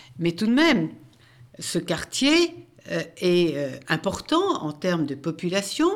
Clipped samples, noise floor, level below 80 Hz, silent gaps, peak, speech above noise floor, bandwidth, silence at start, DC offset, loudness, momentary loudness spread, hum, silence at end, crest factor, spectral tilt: under 0.1%; -51 dBFS; -58 dBFS; none; -6 dBFS; 28 dB; 15.5 kHz; 0.15 s; under 0.1%; -24 LUFS; 11 LU; none; 0 s; 18 dB; -4.5 dB/octave